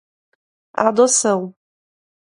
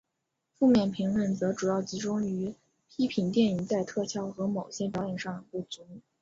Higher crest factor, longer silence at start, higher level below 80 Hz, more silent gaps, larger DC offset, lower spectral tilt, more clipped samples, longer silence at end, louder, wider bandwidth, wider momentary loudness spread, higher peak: about the same, 20 dB vs 16 dB; first, 0.75 s vs 0.6 s; about the same, -66 dBFS vs -64 dBFS; neither; neither; second, -3 dB/octave vs -6 dB/octave; neither; first, 0.8 s vs 0.2 s; first, -16 LUFS vs -30 LUFS; first, 11.5 kHz vs 7.8 kHz; first, 16 LU vs 13 LU; first, 0 dBFS vs -14 dBFS